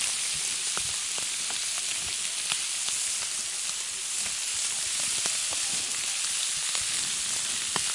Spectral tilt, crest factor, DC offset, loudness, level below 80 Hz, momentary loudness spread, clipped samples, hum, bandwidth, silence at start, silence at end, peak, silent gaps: 2 dB/octave; 24 dB; under 0.1%; -27 LUFS; -64 dBFS; 2 LU; under 0.1%; none; 11.5 kHz; 0 s; 0 s; -6 dBFS; none